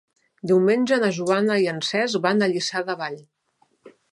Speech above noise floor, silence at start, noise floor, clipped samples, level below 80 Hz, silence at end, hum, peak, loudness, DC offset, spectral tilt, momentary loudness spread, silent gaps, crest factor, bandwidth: 45 dB; 0.45 s; -66 dBFS; under 0.1%; -72 dBFS; 0.95 s; none; -6 dBFS; -22 LUFS; under 0.1%; -5 dB/octave; 11 LU; none; 18 dB; 11.5 kHz